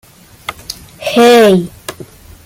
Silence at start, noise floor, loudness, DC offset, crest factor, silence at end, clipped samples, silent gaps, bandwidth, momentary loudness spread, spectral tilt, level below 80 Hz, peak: 0.5 s; -34 dBFS; -9 LUFS; under 0.1%; 12 dB; 0.4 s; under 0.1%; none; 16.5 kHz; 22 LU; -5 dB/octave; -46 dBFS; 0 dBFS